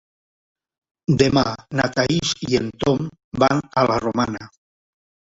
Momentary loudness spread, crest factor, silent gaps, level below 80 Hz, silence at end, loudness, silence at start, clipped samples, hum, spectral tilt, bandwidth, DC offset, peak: 8 LU; 20 dB; 3.24-3.32 s; -48 dBFS; 0.9 s; -20 LUFS; 1.1 s; under 0.1%; none; -5.5 dB/octave; 8 kHz; under 0.1%; -2 dBFS